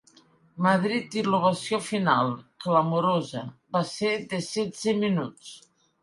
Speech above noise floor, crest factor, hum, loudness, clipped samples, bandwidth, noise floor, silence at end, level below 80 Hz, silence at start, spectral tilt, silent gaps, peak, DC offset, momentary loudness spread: 33 dB; 18 dB; none; -26 LUFS; under 0.1%; 11.5 kHz; -59 dBFS; 0.45 s; -68 dBFS; 0.55 s; -5.5 dB/octave; none; -8 dBFS; under 0.1%; 11 LU